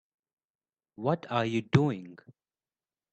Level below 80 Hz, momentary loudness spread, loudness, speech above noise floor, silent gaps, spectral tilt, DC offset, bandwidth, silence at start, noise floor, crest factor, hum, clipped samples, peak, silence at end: -62 dBFS; 12 LU; -29 LUFS; over 61 dB; none; -7.5 dB/octave; under 0.1%; 8.4 kHz; 1 s; under -90 dBFS; 24 dB; none; under 0.1%; -8 dBFS; 0.95 s